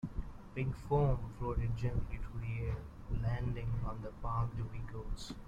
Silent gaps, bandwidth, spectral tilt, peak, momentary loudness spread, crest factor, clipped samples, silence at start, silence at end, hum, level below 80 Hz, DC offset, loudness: none; 9.6 kHz; -8 dB/octave; -20 dBFS; 11 LU; 16 dB; under 0.1%; 0.05 s; 0 s; none; -44 dBFS; under 0.1%; -39 LUFS